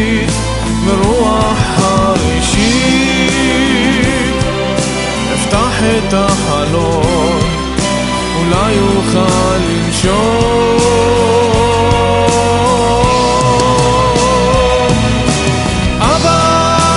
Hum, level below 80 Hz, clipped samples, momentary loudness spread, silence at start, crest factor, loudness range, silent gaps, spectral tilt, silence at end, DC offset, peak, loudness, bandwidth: none; -22 dBFS; under 0.1%; 4 LU; 0 s; 10 dB; 2 LU; none; -4.5 dB/octave; 0 s; under 0.1%; 0 dBFS; -11 LUFS; 11.5 kHz